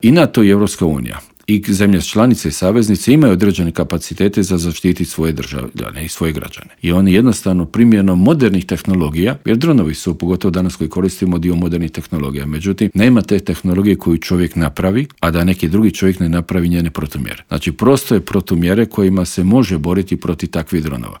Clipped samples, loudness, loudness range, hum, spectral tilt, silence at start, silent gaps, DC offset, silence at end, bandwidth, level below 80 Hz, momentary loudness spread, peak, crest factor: under 0.1%; -14 LUFS; 3 LU; none; -6.5 dB/octave; 0 s; none; under 0.1%; 0 s; 18 kHz; -36 dBFS; 10 LU; 0 dBFS; 14 dB